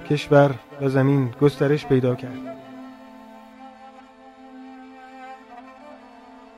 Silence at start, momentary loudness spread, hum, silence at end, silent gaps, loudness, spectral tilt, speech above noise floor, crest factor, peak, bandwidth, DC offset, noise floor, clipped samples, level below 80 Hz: 0 s; 26 LU; none; 0.65 s; none; -20 LUFS; -8 dB/octave; 27 dB; 20 dB; -4 dBFS; 12 kHz; under 0.1%; -46 dBFS; under 0.1%; -58 dBFS